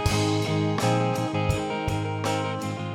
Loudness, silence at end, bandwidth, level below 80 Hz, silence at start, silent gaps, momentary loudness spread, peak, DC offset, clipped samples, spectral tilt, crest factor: -26 LUFS; 0 s; 16.5 kHz; -42 dBFS; 0 s; none; 4 LU; -10 dBFS; under 0.1%; under 0.1%; -5.5 dB/octave; 16 dB